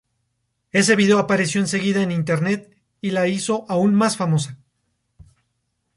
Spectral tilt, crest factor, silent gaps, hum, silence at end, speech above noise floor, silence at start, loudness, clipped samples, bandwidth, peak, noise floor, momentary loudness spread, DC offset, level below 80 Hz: -5 dB/octave; 18 dB; none; none; 1.4 s; 54 dB; 0.75 s; -19 LUFS; under 0.1%; 11.5 kHz; -4 dBFS; -73 dBFS; 8 LU; under 0.1%; -60 dBFS